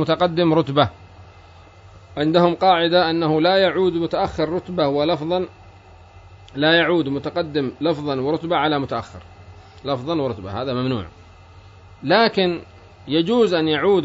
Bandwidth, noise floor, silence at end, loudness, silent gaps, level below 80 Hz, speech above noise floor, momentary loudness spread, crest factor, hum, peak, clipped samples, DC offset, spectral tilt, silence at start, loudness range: 7.8 kHz; -45 dBFS; 0 s; -19 LUFS; none; -50 dBFS; 26 dB; 11 LU; 18 dB; none; -2 dBFS; under 0.1%; under 0.1%; -7 dB/octave; 0 s; 5 LU